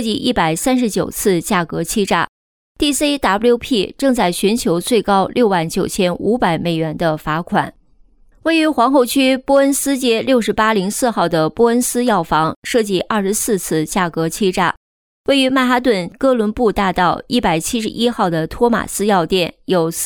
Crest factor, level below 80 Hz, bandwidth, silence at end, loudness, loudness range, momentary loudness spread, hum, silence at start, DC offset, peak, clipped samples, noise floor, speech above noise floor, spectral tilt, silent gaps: 14 dB; -42 dBFS; 20 kHz; 0 s; -16 LUFS; 2 LU; 5 LU; none; 0 s; under 0.1%; -2 dBFS; under 0.1%; -49 dBFS; 34 dB; -4 dB/octave; 2.29-2.75 s, 12.56-12.62 s, 14.77-15.24 s